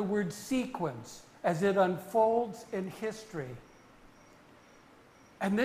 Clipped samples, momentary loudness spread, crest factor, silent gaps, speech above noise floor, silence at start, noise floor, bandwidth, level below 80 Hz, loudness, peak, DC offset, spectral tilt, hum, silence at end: under 0.1%; 15 LU; 20 dB; none; 27 dB; 0 s; -58 dBFS; 15.5 kHz; -66 dBFS; -32 LUFS; -14 dBFS; under 0.1%; -6 dB/octave; none; 0 s